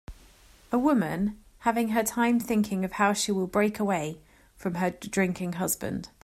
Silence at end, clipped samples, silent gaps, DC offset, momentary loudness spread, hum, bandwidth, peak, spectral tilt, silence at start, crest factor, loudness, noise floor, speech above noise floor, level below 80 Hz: 0.15 s; under 0.1%; none; under 0.1%; 7 LU; none; 16 kHz; -8 dBFS; -5 dB/octave; 0.1 s; 18 dB; -27 LUFS; -55 dBFS; 28 dB; -54 dBFS